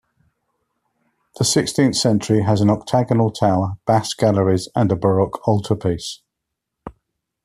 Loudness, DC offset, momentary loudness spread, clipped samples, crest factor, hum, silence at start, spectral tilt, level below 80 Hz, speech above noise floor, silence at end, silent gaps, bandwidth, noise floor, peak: -18 LUFS; under 0.1%; 5 LU; under 0.1%; 16 dB; none; 1.4 s; -5.5 dB/octave; -52 dBFS; 63 dB; 0.55 s; none; 14 kHz; -80 dBFS; -2 dBFS